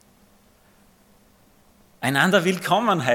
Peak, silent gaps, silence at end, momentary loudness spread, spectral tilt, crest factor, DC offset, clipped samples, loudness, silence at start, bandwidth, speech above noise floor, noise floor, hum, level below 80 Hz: -4 dBFS; none; 0 s; 6 LU; -4.5 dB/octave; 20 dB; under 0.1%; under 0.1%; -20 LUFS; 2 s; 17 kHz; 37 dB; -57 dBFS; none; -66 dBFS